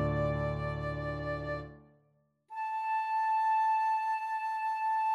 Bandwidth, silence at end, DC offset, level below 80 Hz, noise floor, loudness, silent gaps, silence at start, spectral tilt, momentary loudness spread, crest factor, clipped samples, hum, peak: 11.5 kHz; 0 s; under 0.1%; -50 dBFS; -72 dBFS; -32 LUFS; none; 0 s; -7.5 dB/octave; 11 LU; 12 dB; under 0.1%; none; -20 dBFS